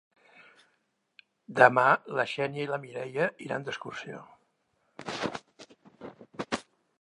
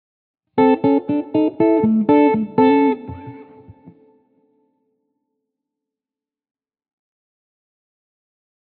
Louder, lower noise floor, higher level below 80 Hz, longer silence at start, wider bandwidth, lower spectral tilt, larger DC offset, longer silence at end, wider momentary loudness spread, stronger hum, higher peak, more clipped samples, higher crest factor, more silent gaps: second, -28 LUFS vs -16 LUFS; second, -75 dBFS vs -90 dBFS; second, -72 dBFS vs -58 dBFS; first, 1.5 s vs 0.55 s; first, 11 kHz vs 4.3 kHz; second, -5 dB/octave vs -6.5 dB/octave; neither; second, 0.4 s vs 5.25 s; first, 23 LU vs 13 LU; neither; about the same, -4 dBFS vs -4 dBFS; neither; first, 28 dB vs 16 dB; neither